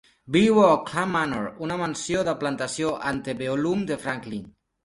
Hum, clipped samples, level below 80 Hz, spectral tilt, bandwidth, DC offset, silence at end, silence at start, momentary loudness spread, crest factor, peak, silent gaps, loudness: none; under 0.1%; -56 dBFS; -5 dB/octave; 11.5 kHz; under 0.1%; 0.35 s; 0.25 s; 11 LU; 20 dB; -4 dBFS; none; -24 LUFS